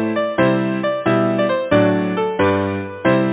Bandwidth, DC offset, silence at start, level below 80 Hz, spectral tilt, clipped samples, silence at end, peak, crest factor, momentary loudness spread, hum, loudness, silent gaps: 4 kHz; under 0.1%; 0 s; -46 dBFS; -11 dB/octave; under 0.1%; 0 s; -2 dBFS; 14 dB; 5 LU; none; -18 LUFS; none